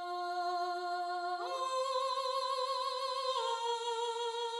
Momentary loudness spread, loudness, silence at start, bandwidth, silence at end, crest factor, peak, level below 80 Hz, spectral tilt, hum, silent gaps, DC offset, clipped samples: 3 LU; -36 LUFS; 0 s; 13 kHz; 0 s; 12 dB; -24 dBFS; under -90 dBFS; 1.5 dB/octave; none; none; under 0.1%; under 0.1%